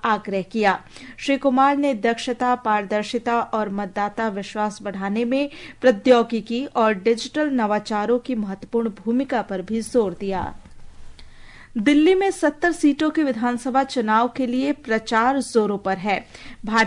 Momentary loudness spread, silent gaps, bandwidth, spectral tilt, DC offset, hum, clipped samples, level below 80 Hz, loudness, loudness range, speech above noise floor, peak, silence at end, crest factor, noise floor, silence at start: 9 LU; none; 11 kHz; -5 dB/octave; under 0.1%; none; under 0.1%; -50 dBFS; -21 LUFS; 4 LU; 21 dB; -4 dBFS; 0 s; 16 dB; -42 dBFS; 0.05 s